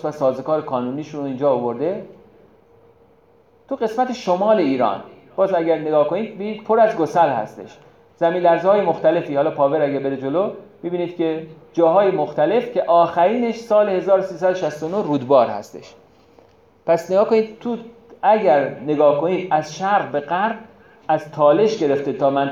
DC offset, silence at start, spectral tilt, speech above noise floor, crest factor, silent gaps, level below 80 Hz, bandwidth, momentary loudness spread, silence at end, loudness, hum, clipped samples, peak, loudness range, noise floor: under 0.1%; 0.05 s; -6.5 dB/octave; 36 dB; 16 dB; none; -66 dBFS; 7.6 kHz; 11 LU; 0 s; -19 LUFS; none; under 0.1%; -2 dBFS; 5 LU; -54 dBFS